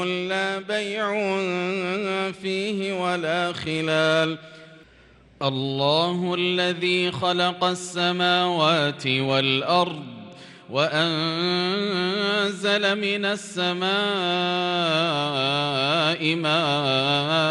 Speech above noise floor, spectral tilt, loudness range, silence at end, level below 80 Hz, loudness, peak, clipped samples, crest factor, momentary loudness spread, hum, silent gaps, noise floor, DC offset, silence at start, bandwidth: 29 dB; -4.5 dB/octave; 4 LU; 0 s; -66 dBFS; -23 LUFS; -6 dBFS; under 0.1%; 18 dB; 6 LU; none; none; -53 dBFS; under 0.1%; 0 s; 11.5 kHz